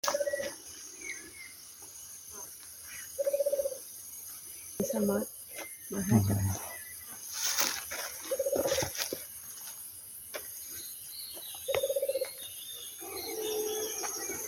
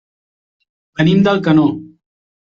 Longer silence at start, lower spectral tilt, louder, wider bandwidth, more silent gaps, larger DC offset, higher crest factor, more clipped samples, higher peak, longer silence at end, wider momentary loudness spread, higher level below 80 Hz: second, 0.05 s vs 1 s; second, -3.5 dB/octave vs -8 dB/octave; second, -35 LUFS vs -13 LUFS; first, 17 kHz vs 7 kHz; neither; neither; first, 26 dB vs 14 dB; neither; second, -10 dBFS vs -2 dBFS; second, 0 s vs 0.65 s; second, 13 LU vs 17 LU; second, -62 dBFS vs -52 dBFS